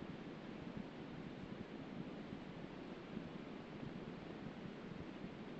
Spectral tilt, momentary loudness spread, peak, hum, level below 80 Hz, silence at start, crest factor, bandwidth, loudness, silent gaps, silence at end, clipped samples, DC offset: -5.5 dB/octave; 1 LU; -34 dBFS; none; -70 dBFS; 0 s; 16 dB; 8 kHz; -51 LUFS; none; 0 s; under 0.1%; under 0.1%